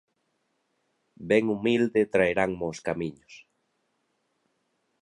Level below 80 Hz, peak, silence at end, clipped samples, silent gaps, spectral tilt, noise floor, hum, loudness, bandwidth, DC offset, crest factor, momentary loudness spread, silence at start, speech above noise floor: -60 dBFS; -8 dBFS; 1.65 s; under 0.1%; none; -6 dB/octave; -75 dBFS; none; -26 LUFS; 11 kHz; under 0.1%; 22 dB; 10 LU; 1.2 s; 50 dB